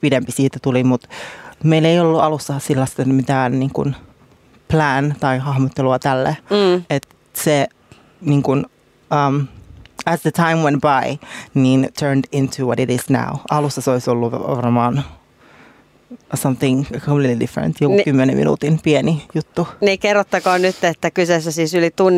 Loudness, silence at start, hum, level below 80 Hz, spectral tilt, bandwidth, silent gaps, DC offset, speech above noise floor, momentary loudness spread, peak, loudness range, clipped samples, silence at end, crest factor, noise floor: -17 LUFS; 0 s; none; -50 dBFS; -6 dB/octave; 15.5 kHz; none; under 0.1%; 33 dB; 8 LU; -2 dBFS; 3 LU; under 0.1%; 0 s; 16 dB; -50 dBFS